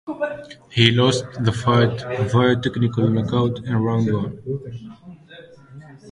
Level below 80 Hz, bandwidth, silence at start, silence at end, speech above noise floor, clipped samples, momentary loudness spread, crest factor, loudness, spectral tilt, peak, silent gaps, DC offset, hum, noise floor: -48 dBFS; 11 kHz; 0.05 s; 0 s; 24 dB; under 0.1%; 13 LU; 20 dB; -20 LUFS; -6 dB/octave; 0 dBFS; none; under 0.1%; none; -44 dBFS